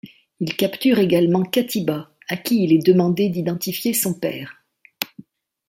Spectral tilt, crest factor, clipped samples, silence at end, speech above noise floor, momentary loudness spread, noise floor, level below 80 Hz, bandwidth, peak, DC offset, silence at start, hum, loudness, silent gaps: -5.5 dB/octave; 20 dB; under 0.1%; 0.65 s; 28 dB; 13 LU; -46 dBFS; -64 dBFS; 16.5 kHz; 0 dBFS; under 0.1%; 0.05 s; none; -20 LUFS; none